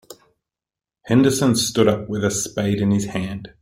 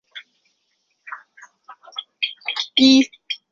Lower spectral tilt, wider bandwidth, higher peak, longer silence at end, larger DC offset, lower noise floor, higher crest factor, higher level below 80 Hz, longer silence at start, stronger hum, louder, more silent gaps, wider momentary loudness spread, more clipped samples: first, -5 dB/octave vs -2 dB/octave; first, 16.5 kHz vs 7.4 kHz; about the same, -2 dBFS vs -2 dBFS; about the same, 0.15 s vs 0.15 s; neither; first, -90 dBFS vs -70 dBFS; about the same, 18 dB vs 22 dB; first, -50 dBFS vs -64 dBFS; about the same, 0.1 s vs 0.15 s; neither; about the same, -19 LUFS vs -18 LUFS; neither; second, 8 LU vs 25 LU; neither